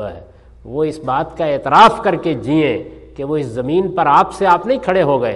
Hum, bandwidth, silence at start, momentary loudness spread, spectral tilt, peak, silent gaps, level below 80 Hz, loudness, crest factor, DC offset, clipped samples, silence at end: none; 11.5 kHz; 0 s; 13 LU; -6.5 dB/octave; 0 dBFS; none; -44 dBFS; -15 LUFS; 16 dB; under 0.1%; under 0.1%; 0 s